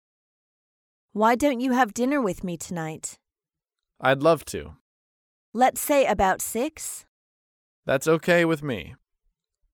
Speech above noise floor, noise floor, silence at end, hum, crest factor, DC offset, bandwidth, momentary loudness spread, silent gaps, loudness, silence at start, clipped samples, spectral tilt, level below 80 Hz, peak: over 67 dB; under -90 dBFS; 0.8 s; none; 20 dB; under 0.1%; 18 kHz; 15 LU; 4.81-5.53 s, 7.08-7.83 s; -24 LUFS; 1.15 s; under 0.1%; -4.5 dB/octave; -54 dBFS; -6 dBFS